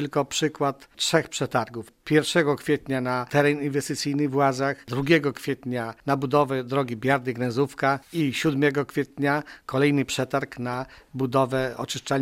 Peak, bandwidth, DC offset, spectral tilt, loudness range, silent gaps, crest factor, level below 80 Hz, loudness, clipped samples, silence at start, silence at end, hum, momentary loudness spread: -6 dBFS; 16 kHz; under 0.1%; -5 dB/octave; 1 LU; none; 20 dB; -58 dBFS; -25 LUFS; under 0.1%; 0 s; 0 s; none; 8 LU